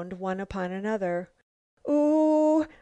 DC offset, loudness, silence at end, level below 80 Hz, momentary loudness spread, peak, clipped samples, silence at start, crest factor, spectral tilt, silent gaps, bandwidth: under 0.1%; -26 LUFS; 0.15 s; -56 dBFS; 11 LU; -14 dBFS; under 0.1%; 0 s; 12 dB; -7.5 dB/octave; 1.43-1.77 s; 8.6 kHz